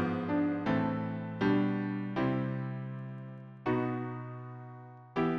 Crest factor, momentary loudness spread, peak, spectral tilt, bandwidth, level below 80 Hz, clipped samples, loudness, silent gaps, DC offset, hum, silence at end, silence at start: 16 dB; 15 LU; -18 dBFS; -9 dB/octave; 6.4 kHz; -64 dBFS; under 0.1%; -33 LUFS; none; under 0.1%; none; 0 s; 0 s